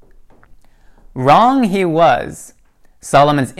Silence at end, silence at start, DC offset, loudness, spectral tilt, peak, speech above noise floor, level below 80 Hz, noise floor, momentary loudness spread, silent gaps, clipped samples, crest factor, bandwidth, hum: 0.1 s; 1.15 s; under 0.1%; -13 LUFS; -6 dB/octave; 0 dBFS; 32 dB; -46 dBFS; -44 dBFS; 23 LU; none; under 0.1%; 16 dB; 14 kHz; none